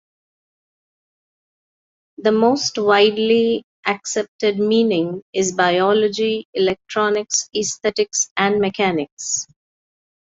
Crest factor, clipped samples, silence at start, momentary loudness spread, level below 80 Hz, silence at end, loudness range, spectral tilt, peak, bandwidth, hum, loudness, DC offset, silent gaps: 18 dB; under 0.1%; 2.2 s; 8 LU; -62 dBFS; 0.8 s; 2 LU; -3 dB/octave; -2 dBFS; 8 kHz; none; -18 LUFS; under 0.1%; 3.64-3.83 s, 4.28-4.39 s, 5.22-5.33 s, 6.45-6.53 s, 8.31-8.36 s, 9.12-9.17 s